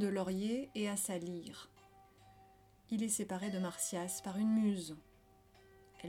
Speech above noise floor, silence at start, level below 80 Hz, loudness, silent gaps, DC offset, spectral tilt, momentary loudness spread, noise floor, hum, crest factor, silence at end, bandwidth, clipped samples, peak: 28 dB; 0 s; -72 dBFS; -38 LUFS; none; under 0.1%; -4.5 dB/octave; 15 LU; -66 dBFS; none; 16 dB; 0 s; 17 kHz; under 0.1%; -24 dBFS